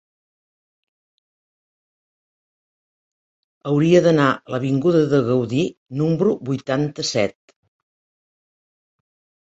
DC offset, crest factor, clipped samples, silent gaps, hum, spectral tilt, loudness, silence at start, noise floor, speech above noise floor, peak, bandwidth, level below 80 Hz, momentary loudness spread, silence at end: under 0.1%; 20 dB; under 0.1%; 5.77-5.86 s; none; -6.5 dB/octave; -19 LUFS; 3.65 s; under -90 dBFS; over 72 dB; -2 dBFS; 8.2 kHz; -60 dBFS; 10 LU; 2.15 s